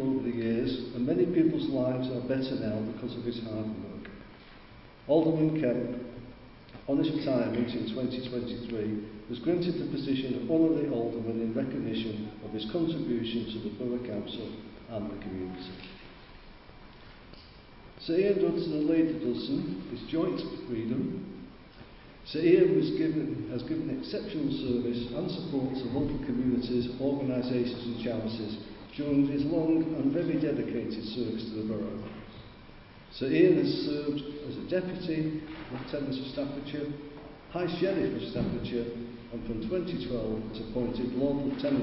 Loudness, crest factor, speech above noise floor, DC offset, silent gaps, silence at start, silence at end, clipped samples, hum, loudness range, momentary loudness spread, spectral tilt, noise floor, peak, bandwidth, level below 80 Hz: -31 LUFS; 20 dB; 21 dB; under 0.1%; none; 0 s; 0 s; under 0.1%; none; 5 LU; 18 LU; -11 dB/octave; -51 dBFS; -10 dBFS; 5.8 kHz; -54 dBFS